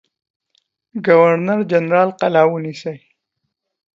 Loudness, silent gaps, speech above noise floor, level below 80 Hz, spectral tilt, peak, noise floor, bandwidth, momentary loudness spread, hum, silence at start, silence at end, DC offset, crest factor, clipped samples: -15 LUFS; none; 61 dB; -68 dBFS; -7.5 dB/octave; 0 dBFS; -76 dBFS; 7.6 kHz; 16 LU; none; 0.95 s; 0.95 s; under 0.1%; 18 dB; under 0.1%